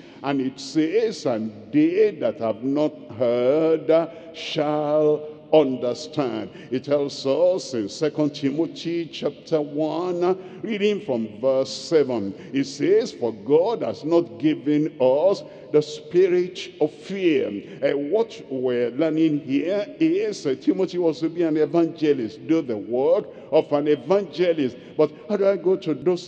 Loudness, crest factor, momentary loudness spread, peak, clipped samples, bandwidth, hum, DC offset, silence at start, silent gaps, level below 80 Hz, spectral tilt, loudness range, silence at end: -23 LUFS; 18 dB; 7 LU; -4 dBFS; under 0.1%; 8.8 kHz; none; under 0.1%; 0 s; none; -72 dBFS; -6 dB/octave; 3 LU; 0 s